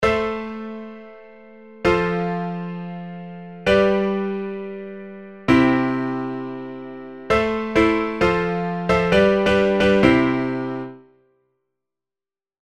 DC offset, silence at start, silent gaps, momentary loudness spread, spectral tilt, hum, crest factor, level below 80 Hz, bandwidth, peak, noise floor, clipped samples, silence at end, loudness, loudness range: 0.3%; 0 s; none; 19 LU; -7 dB/octave; none; 22 dB; -42 dBFS; 12 kHz; 0 dBFS; under -90 dBFS; under 0.1%; 1.8 s; -20 LUFS; 6 LU